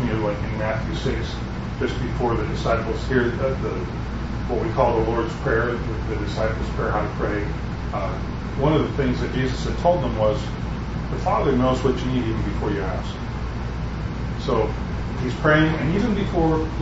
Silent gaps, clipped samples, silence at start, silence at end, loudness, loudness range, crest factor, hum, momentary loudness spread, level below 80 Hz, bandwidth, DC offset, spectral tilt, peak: none; under 0.1%; 0 s; 0 s; -23 LUFS; 2 LU; 18 dB; none; 9 LU; -30 dBFS; 8 kHz; under 0.1%; -7 dB/octave; -4 dBFS